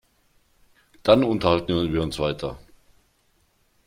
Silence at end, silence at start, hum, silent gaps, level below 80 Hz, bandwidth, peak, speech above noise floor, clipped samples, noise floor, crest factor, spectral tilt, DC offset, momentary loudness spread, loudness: 1.3 s; 1.05 s; none; none; -48 dBFS; 15.5 kHz; -2 dBFS; 44 dB; under 0.1%; -65 dBFS; 22 dB; -6.5 dB/octave; under 0.1%; 14 LU; -22 LUFS